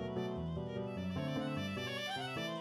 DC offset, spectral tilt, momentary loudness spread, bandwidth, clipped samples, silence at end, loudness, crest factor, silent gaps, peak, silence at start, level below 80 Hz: under 0.1%; -6 dB/octave; 2 LU; 15 kHz; under 0.1%; 0 s; -40 LUFS; 12 dB; none; -28 dBFS; 0 s; -60 dBFS